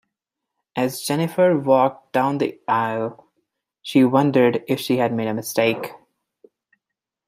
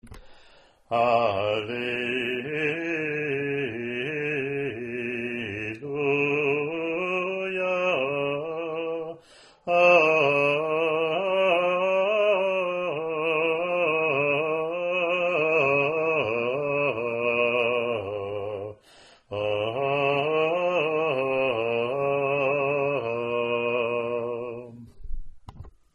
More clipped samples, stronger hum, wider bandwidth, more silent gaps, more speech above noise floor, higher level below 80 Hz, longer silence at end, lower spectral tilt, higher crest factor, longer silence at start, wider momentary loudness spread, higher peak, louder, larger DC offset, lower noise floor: neither; neither; first, 16 kHz vs 10.5 kHz; neither; first, 64 dB vs 30 dB; second, -68 dBFS vs -50 dBFS; first, 1.35 s vs 0.25 s; about the same, -6 dB/octave vs -6 dB/octave; about the same, 18 dB vs 18 dB; first, 0.75 s vs 0.05 s; about the same, 11 LU vs 10 LU; first, -2 dBFS vs -8 dBFS; first, -20 LUFS vs -25 LUFS; neither; first, -84 dBFS vs -55 dBFS